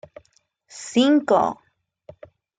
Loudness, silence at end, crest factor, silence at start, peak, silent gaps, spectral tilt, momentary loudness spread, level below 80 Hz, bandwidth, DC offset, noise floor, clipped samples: -20 LUFS; 1.05 s; 18 dB; 0.75 s; -6 dBFS; none; -4.5 dB/octave; 23 LU; -68 dBFS; 9.4 kHz; under 0.1%; -64 dBFS; under 0.1%